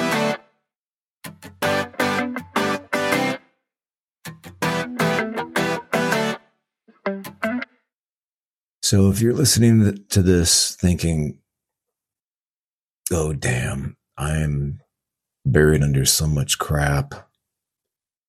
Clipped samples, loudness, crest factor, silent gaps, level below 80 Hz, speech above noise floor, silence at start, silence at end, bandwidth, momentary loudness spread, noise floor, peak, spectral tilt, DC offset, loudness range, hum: under 0.1%; -20 LUFS; 20 dB; 0.76-1.21 s, 7.94-8.04 s, 8.10-8.81 s, 12.23-12.82 s, 12.90-13.02 s; -38 dBFS; over 71 dB; 0 s; 1.05 s; 16 kHz; 17 LU; under -90 dBFS; -2 dBFS; -4.5 dB/octave; under 0.1%; 8 LU; none